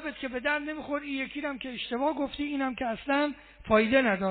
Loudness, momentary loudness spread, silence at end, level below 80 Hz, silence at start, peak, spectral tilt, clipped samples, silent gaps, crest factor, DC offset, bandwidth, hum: -29 LUFS; 11 LU; 0 s; -56 dBFS; 0 s; -10 dBFS; -3 dB/octave; under 0.1%; none; 18 dB; under 0.1%; 4.6 kHz; none